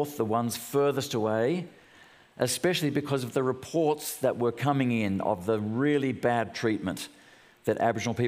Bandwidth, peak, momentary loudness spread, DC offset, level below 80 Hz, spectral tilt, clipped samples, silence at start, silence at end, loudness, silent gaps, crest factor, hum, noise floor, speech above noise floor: 16 kHz; -10 dBFS; 5 LU; under 0.1%; -70 dBFS; -5.5 dB/octave; under 0.1%; 0 s; 0 s; -28 LUFS; none; 18 dB; none; -56 dBFS; 28 dB